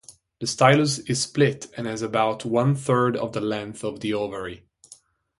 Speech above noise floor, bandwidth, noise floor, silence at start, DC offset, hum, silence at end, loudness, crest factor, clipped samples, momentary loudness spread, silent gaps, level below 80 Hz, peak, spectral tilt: 30 dB; 11.5 kHz; -53 dBFS; 0.1 s; under 0.1%; none; 0.45 s; -23 LUFS; 22 dB; under 0.1%; 13 LU; none; -60 dBFS; -2 dBFS; -5 dB/octave